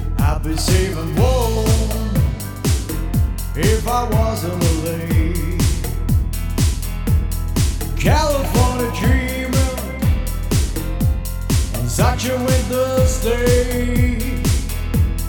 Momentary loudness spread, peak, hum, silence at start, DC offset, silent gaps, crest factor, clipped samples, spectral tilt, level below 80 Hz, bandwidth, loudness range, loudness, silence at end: 5 LU; -2 dBFS; none; 0 s; under 0.1%; none; 14 dB; under 0.1%; -5.5 dB/octave; -22 dBFS; over 20 kHz; 2 LU; -19 LUFS; 0 s